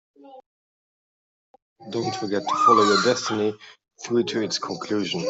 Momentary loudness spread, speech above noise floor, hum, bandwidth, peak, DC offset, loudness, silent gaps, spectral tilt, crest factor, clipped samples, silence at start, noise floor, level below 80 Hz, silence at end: 12 LU; over 67 dB; none; 8.2 kHz; -4 dBFS; under 0.1%; -22 LUFS; 0.46-1.54 s, 1.62-1.76 s; -4 dB/octave; 20 dB; under 0.1%; 0.25 s; under -90 dBFS; -70 dBFS; 0 s